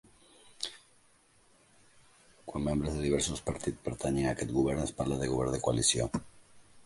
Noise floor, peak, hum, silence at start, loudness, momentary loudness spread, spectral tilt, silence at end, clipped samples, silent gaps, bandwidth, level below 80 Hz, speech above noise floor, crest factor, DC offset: -65 dBFS; -14 dBFS; none; 0.45 s; -32 LUFS; 13 LU; -4.5 dB/octave; 0.05 s; under 0.1%; none; 11.5 kHz; -48 dBFS; 34 dB; 20 dB; under 0.1%